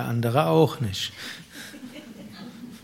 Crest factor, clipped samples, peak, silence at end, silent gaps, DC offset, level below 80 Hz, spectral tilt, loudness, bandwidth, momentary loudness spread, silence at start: 22 dB; under 0.1%; -6 dBFS; 0.05 s; none; under 0.1%; -62 dBFS; -6 dB/octave; -23 LUFS; 16 kHz; 21 LU; 0 s